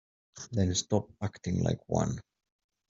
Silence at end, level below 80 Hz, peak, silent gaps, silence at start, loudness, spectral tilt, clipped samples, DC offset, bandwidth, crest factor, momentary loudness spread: 0.7 s; -58 dBFS; -12 dBFS; none; 0.35 s; -32 LUFS; -5.5 dB/octave; under 0.1%; under 0.1%; 7.8 kHz; 22 dB; 9 LU